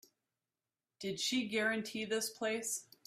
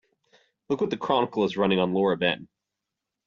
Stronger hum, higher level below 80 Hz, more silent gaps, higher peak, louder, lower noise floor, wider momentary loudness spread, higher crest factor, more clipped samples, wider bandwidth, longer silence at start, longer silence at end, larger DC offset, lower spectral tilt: neither; second, -82 dBFS vs -64 dBFS; neither; second, -22 dBFS vs -8 dBFS; second, -37 LUFS vs -25 LUFS; first, under -90 dBFS vs -86 dBFS; about the same, 6 LU vs 6 LU; about the same, 18 dB vs 18 dB; neither; first, 16 kHz vs 7.2 kHz; first, 1 s vs 0.7 s; second, 0.25 s vs 0.8 s; neither; second, -2 dB/octave vs -4 dB/octave